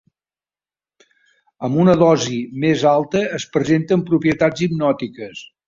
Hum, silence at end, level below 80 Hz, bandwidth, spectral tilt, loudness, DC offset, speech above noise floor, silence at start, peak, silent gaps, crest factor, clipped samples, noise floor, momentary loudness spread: none; 0.2 s; -54 dBFS; 7.6 kHz; -6.5 dB/octave; -17 LUFS; under 0.1%; over 73 dB; 1.6 s; -2 dBFS; none; 16 dB; under 0.1%; under -90 dBFS; 11 LU